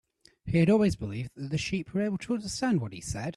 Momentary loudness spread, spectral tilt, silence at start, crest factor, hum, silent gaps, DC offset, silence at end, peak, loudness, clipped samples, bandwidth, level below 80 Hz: 12 LU; -6 dB/octave; 0.45 s; 16 dB; none; none; under 0.1%; 0.05 s; -12 dBFS; -29 LUFS; under 0.1%; 12.5 kHz; -52 dBFS